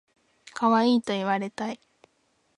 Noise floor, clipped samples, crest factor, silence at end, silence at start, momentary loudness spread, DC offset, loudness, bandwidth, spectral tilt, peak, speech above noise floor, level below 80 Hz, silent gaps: -70 dBFS; under 0.1%; 18 dB; 0.85 s; 0.55 s; 17 LU; under 0.1%; -25 LUFS; 10.5 kHz; -5.5 dB/octave; -10 dBFS; 45 dB; -74 dBFS; none